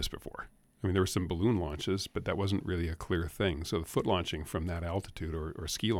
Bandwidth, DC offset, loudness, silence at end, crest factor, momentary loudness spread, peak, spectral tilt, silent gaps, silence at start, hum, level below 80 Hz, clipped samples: 16.5 kHz; under 0.1%; -34 LUFS; 0 s; 18 dB; 8 LU; -16 dBFS; -5.5 dB/octave; none; 0 s; none; -46 dBFS; under 0.1%